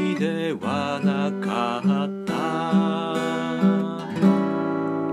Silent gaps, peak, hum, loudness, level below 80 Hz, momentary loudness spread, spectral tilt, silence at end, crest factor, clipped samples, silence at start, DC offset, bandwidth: none; -6 dBFS; none; -23 LUFS; -68 dBFS; 5 LU; -7 dB/octave; 0 s; 16 dB; under 0.1%; 0 s; under 0.1%; 11 kHz